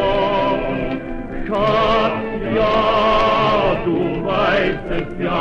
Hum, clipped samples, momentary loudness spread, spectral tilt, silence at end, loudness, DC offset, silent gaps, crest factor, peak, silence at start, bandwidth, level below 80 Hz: none; under 0.1%; 9 LU; -7 dB/octave; 0 s; -18 LUFS; under 0.1%; none; 14 dB; -2 dBFS; 0 s; 8 kHz; -32 dBFS